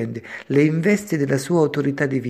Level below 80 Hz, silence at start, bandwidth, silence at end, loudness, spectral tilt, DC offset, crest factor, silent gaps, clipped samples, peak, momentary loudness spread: -62 dBFS; 0 s; 15 kHz; 0 s; -20 LUFS; -7 dB/octave; under 0.1%; 16 dB; none; under 0.1%; -4 dBFS; 6 LU